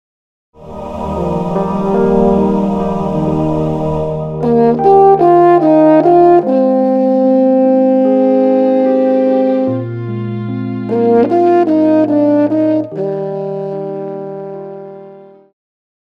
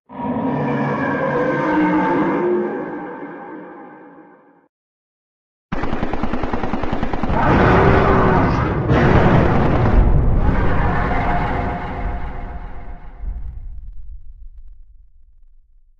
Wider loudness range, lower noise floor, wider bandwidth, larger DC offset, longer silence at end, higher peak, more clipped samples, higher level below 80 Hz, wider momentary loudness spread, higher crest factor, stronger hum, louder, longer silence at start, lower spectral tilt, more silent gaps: second, 6 LU vs 18 LU; second, -37 dBFS vs -48 dBFS; about the same, 7 kHz vs 6.6 kHz; neither; second, 0.8 s vs 1.25 s; about the same, 0 dBFS vs 0 dBFS; neither; second, -40 dBFS vs -24 dBFS; second, 14 LU vs 21 LU; second, 12 dB vs 18 dB; neither; first, -12 LUFS vs -18 LUFS; first, 0.6 s vs 0.1 s; about the same, -10 dB/octave vs -9 dB/octave; second, none vs 4.69-5.69 s